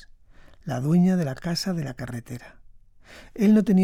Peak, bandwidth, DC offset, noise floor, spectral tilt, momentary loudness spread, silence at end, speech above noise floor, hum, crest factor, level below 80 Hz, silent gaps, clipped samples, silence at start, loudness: -10 dBFS; 15.5 kHz; under 0.1%; -49 dBFS; -7 dB/octave; 20 LU; 0 s; 27 dB; none; 16 dB; -52 dBFS; none; under 0.1%; 0.65 s; -24 LUFS